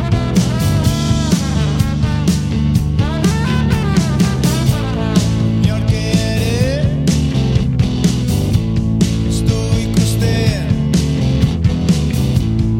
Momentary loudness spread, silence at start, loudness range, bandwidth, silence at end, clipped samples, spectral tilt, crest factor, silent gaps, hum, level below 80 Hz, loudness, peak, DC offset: 2 LU; 0 s; 0 LU; 17 kHz; 0 s; under 0.1%; -6 dB/octave; 14 dB; none; none; -24 dBFS; -15 LUFS; 0 dBFS; under 0.1%